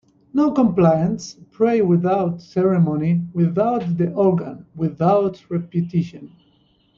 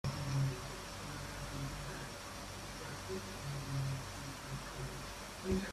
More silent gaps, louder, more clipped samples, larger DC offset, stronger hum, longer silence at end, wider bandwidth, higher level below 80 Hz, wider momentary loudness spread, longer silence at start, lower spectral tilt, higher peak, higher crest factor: neither; first, -19 LUFS vs -43 LUFS; neither; neither; neither; first, 0.7 s vs 0 s; second, 7.2 kHz vs 15 kHz; about the same, -56 dBFS vs -54 dBFS; about the same, 10 LU vs 8 LU; first, 0.35 s vs 0.05 s; first, -9 dB/octave vs -5 dB/octave; first, -4 dBFS vs -24 dBFS; about the same, 16 dB vs 18 dB